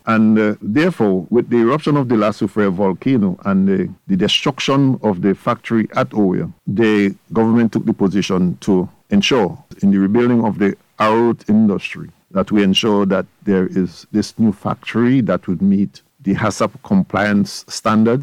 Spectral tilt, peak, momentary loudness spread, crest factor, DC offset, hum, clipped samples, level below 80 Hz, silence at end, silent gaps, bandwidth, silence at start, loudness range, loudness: -6.5 dB/octave; -4 dBFS; 7 LU; 12 dB; under 0.1%; none; under 0.1%; -52 dBFS; 0 s; none; 11.5 kHz; 0.05 s; 2 LU; -16 LUFS